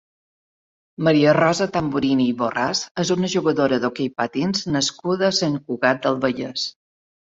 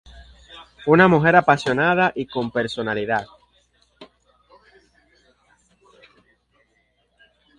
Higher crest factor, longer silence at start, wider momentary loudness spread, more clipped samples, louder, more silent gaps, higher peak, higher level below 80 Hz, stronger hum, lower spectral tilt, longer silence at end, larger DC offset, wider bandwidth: about the same, 20 dB vs 22 dB; first, 1 s vs 0.15 s; second, 7 LU vs 12 LU; neither; about the same, -20 LUFS vs -18 LUFS; first, 2.91-2.95 s vs none; about the same, -2 dBFS vs 0 dBFS; about the same, -58 dBFS vs -54 dBFS; second, none vs 60 Hz at -55 dBFS; second, -4.5 dB/octave vs -6.5 dB/octave; second, 0.6 s vs 3.55 s; neither; second, 8 kHz vs 10.5 kHz